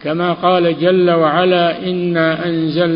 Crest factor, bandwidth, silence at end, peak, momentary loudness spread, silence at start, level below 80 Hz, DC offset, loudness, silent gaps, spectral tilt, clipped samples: 14 dB; 5.4 kHz; 0 s; 0 dBFS; 5 LU; 0 s; -54 dBFS; under 0.1%; -14 LUFS; none; -11.5 dB/octave; under 0.1%